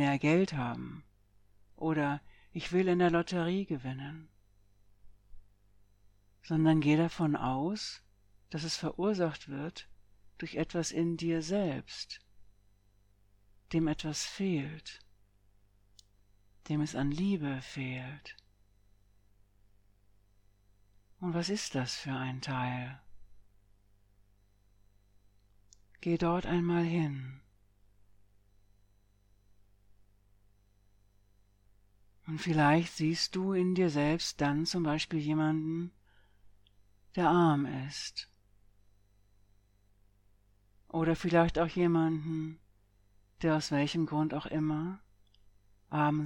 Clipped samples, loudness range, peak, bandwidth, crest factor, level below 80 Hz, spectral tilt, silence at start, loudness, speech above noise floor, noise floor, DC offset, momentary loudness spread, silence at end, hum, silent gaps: under 0.1%; 9 LU; -14 dBFS; 12 kHz; 22 dB; -60 dBFS; -6 dB/octave; 0 s; -32 LUFS; 35 dB; -67 dBFS; under 0.1%; 15 LU; 0 s; 50 Hz at -65 dBFS; none